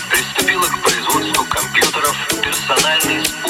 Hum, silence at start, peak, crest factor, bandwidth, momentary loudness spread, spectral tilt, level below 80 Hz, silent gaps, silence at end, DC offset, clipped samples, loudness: none; 0 s; 0 dBFS; 16 dB; 19 kHz; 3 LU; -1 dB/octave; -44 dBFS; none; 0 s; under 0.1%; under 0.1%; -15 LUFS